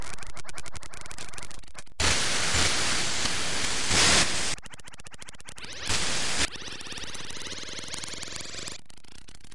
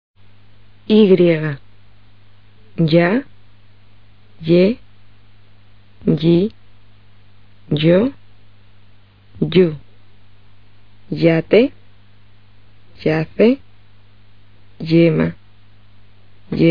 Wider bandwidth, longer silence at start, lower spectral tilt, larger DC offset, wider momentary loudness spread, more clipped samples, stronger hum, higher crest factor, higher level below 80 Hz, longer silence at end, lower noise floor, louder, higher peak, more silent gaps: first, 11.5 kHz vs 5.2 kHz; second, 0 s vs 0.9 s; second, -1 dB/octave vs -6.5 dB/octave; about the same, 2% vs 1%; first, 21 LU vs 13 LU; neither; second, none vs 50 Hz at -50 dBFS; about the same, 20 dB vs 18 dB; about the same, -46 dBFS vs -50 dBFS; about the same, 0 s vs 0 s; about the same, -52 dBFS vs -50 dBFS; second, -26 LUFS vs -16 LUFS; second, -8 dBFS vs 0 dBFS; neither